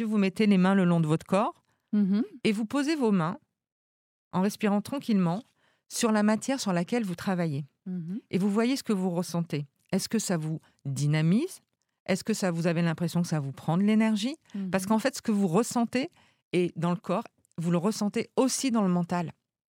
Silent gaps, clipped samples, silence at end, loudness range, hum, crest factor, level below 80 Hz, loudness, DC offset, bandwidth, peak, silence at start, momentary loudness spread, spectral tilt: 3.72-4.31 s, 12.00-12.06 s, 16.44-16.51 s; under 0.1%; 0.45 s; 3 LU; none; 18 dB; -74 dBFS; -28 LUFS; under 0.1%; 17 kHz; -10 dBFS; 0 s; 11 LU; -6 dB/octave